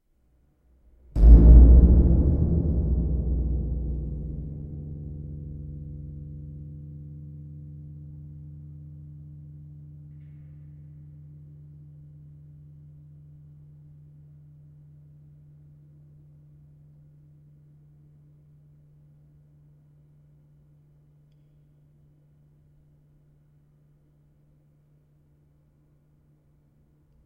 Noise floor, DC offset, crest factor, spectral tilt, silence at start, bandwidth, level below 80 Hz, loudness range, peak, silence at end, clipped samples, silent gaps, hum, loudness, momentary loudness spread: -64 dBFS; under 0.1%; 24 dB; -13 dB/octave; 1.15 s; 1.4 kHz; -26 dBFS; 30 LU; -2 dBFS; 19.9 s; under 0.1%; none; none; -21 LUFS; 31 LU